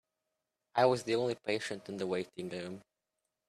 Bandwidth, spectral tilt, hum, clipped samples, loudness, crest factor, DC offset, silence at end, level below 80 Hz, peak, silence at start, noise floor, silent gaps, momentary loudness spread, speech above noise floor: 13.5 kHz; -5 dB/octave; none; under 0.1%; -34 LUFS; 22 dB; under 0.1%; 0.7 s; -78 dBFS; -14 dBFS; 0.75 s; -87 dBFS; none; 13 LU; 53 dB